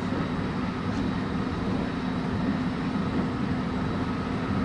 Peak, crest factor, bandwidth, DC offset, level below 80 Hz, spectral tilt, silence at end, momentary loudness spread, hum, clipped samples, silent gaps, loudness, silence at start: -16 dBFS; 12 dB; 10.5 kHz; under 0.1%; -42 dBFS; -7.5 dB/octave; 0 s; 2 LU; none; under 0.1%; none; -29 LUFS; 0 s